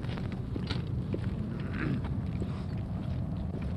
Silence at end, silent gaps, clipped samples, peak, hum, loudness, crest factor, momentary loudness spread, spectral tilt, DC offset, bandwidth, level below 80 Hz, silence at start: 0 s; none; under 0.1%; -16 dBFS; none; -35 LUFS; 16 dB; 3 LU; -8.5 dB/octave; under 0.1%; 10 kHz; -42 dBFS; 0 s